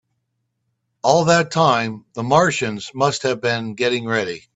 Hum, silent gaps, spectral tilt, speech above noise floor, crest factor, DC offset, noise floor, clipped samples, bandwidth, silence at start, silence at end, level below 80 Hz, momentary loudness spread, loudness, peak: none; none; -4.5 dB/octave; 55 dB; 20 dB; under 0.1%; -73 dBFS; under 0.1%; 8.4 kHz; 1.05 s; 0.15 s; -58 dBFS; 8 LU; -19 LUFS; 0 dBFS